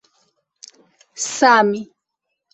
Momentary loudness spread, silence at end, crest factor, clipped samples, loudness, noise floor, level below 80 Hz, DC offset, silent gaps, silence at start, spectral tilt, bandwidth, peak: 17 LU; 0.7 s; 20 dB; under 0.1%; -16 LUFS; -78 dBFS; -68 dBFS; under 0.1%; none; 1.15 s; -2.5 dB/octave; 8.6 kHz; -2 dBFS